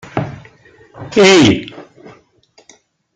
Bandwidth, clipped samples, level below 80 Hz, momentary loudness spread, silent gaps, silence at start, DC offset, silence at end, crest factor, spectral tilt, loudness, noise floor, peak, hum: 9.4 kHz; under 0.1%; -48 dBFS; 24 LU; none; 0.15 s; under 0.1%; 1.35 s; 16 dB; -4.5 dB/octave; -11 LUFS; -52 dBFS; 0 dBFS; none